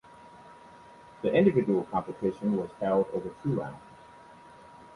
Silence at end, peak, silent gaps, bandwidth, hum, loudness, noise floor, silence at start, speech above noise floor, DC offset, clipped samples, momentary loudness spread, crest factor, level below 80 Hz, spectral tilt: 0.1 s; -10 dBFS; none; 11 kHz; none; -28 LUFS; -52 dBFS; 0.25 s; 24 dB; under 0.1%; under 0.1%; 10 LU; 20 dB; -62 dBFS; -9 dB/octave